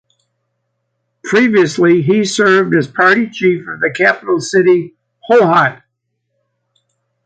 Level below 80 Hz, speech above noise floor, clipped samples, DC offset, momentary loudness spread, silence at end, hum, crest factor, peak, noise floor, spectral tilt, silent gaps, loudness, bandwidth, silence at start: -60 dBFS; 59 dB; under 0.1%; under 0.1%; 7 LU; 1.5 s; none; 14 dB; 0 dBFS; -70 dBFS; -5.5 dB/octave; none; -12 LUFS; 9.2 kHz; 1.25 s